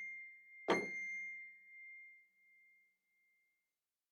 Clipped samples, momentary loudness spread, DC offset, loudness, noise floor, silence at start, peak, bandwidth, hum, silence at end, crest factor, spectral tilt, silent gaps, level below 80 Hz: under 0.1%; 18 LU; under 0.1%; -43 LUFS; under -90 dBFS; 0 s; -22 dBFS; 10.5 kHz; none; 1.45 s; 26 dB; -4 dB/octave; none; under -90 dBFS